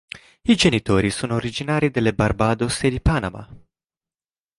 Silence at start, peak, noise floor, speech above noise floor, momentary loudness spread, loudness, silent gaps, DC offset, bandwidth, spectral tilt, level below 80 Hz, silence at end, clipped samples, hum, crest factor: 0.15 s; -4 dBFS; under -90 dBFS; over 70 dB; 10 LU; -20 LUFS; none; under 0.1%; 11.5 kHz; -5.5 dB/octave; -36 dBFS; 1 s; under 0.1%; none; 18 dB